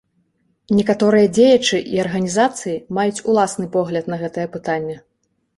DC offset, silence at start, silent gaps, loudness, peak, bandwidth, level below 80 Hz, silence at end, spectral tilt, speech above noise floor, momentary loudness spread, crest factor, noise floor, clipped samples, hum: under 0.1%; 0.7 s; none; -18 LUFS; -2 dBFS; 11.5 kHz; -56 dBFS; 0.6 s; -5 dB/octave; 47 dB; 12 LU; 16 dB; -64 dBFS; under 0.1%; none